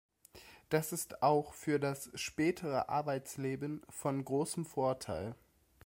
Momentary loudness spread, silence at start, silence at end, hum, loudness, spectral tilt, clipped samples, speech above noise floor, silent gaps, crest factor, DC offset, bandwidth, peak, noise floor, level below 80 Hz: 10 LU; 0.35 s; 0.5 s; none; -36 LUFS; -5 dB/octave; under 0.1%; 23 dB; none; 20 dB; under 0.1%; 16.5 kHz; -18 dBFS; -59 dBFS; -68 dBFS